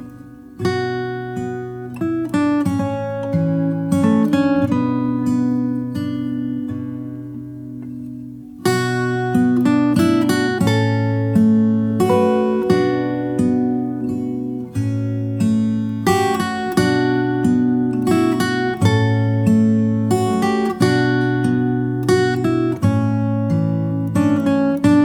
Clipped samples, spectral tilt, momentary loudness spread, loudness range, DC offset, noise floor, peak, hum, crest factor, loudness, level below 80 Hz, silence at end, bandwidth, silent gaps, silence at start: under 0.1%; -7 dB/octave; 10 LU; 5 LU; under 0.1%; -38 dBFS; -2 dBFS; none; 16 dB; -18 LUFS; -50 dBFS; 0 s; 17.5 kHz; none; 0 s